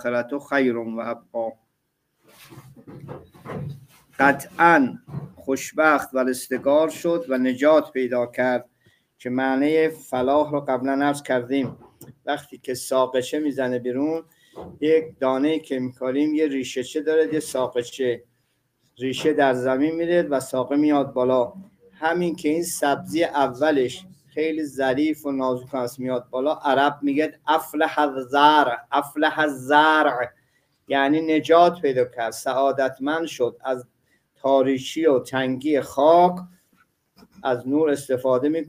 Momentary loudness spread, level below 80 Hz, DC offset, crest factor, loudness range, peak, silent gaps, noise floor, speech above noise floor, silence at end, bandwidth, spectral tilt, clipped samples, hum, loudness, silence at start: 12 LU; -66 dBFS; under 0.1%; 20 dB; 5 LU; -2 dBFS; none; -74 dBFS; 52 dB; 0 s; 16 kHz; -5 dB/octave; under 0.1%; none; -22 LUFS; 0 s